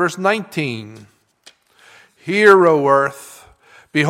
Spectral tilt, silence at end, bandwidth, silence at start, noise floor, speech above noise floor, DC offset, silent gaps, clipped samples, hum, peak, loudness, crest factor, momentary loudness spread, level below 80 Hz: -5.5 dB/octave; 0 s; 15.5 kHz; 0 s; -51 dBFS; 36 dB; under 0.1%; none; under 0.1%; none; 0 dBFS; -15 LUFS; 18 dB; 20 LU; -62 dBFS